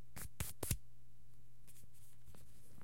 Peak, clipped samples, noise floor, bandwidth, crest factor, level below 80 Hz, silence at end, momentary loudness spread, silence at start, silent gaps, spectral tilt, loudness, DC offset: -20 dBFS; under 0.1%; -66 dBFS; 16.5 kHz; 30 dB; -58 dBFS; 0 s; 25 LU; 0 s; none; -3.5 dB/octave; -45 LUFS; 0.6%